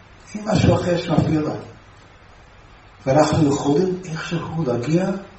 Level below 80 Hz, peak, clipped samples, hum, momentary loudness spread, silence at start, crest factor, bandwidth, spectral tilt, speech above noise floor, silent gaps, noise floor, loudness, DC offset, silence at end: -44 dBFS; -4 dBFS; under 0.1%; none; 11 LU; 0.3 s; 18 dB; 8.4 kHz; -6.5 dB/octave; 27 dB; none; -46 dBFS; -20 LUFS; under 0.1%; 0 s